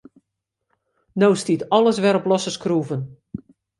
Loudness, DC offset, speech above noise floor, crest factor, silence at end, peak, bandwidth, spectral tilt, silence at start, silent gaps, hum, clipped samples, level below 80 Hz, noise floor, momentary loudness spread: -20 LUFS; under 0.1%; 61 dB; 18 dB; 0.45 s; -2 dBFS; 11.5 kHz; -5.5 dB/octave; 1.15 s; none; none; under 0.1%; -62 dBFS; -80 dBFS; 19 LU